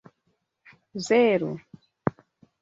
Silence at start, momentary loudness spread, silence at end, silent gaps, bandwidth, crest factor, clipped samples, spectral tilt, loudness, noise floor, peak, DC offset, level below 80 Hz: 0.95 s; 18 LU; 0.5 s; none; 7.8 kHz; 22 dB; under 0.1%; -5.5 dB/octave; -25 LUFS; -74 dBFS; -4 dBFS; under 0.1%; -64 dBFS